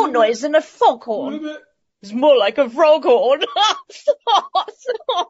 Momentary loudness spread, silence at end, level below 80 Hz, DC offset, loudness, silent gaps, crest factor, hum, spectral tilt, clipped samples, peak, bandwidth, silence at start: 12 LU; 0.05 s; -74 dBFS; under 0.1%; -17 LUFS; none; 14 dB; none; 0 dB/octave; under 0.1%; -2 dBFS; 8 kHz; 0 s